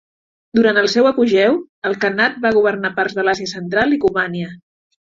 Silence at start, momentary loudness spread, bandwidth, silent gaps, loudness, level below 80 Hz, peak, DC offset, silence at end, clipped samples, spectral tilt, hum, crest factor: 0.55 s; 8 LU; 7.6 kHz; 1.69-1.82 s; -16 LUFS; -54 dBFS; -2 dBFS; under 0.1%; 0.5 s; under 0.1%; -5 dB/octave; none; 14 dB